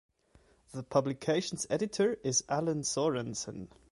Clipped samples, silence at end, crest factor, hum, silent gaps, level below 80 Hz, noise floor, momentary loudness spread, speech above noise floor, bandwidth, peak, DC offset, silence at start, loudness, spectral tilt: under 0.1%; 0.25 s; 20 dB; none; none; -66 dBFS; -65 dBFS; 12 LU; 33 dB; 11.5 kHz; -12 dBFS; under 0.1%; 0.7 s; -32 LUFS; -4 dB/octave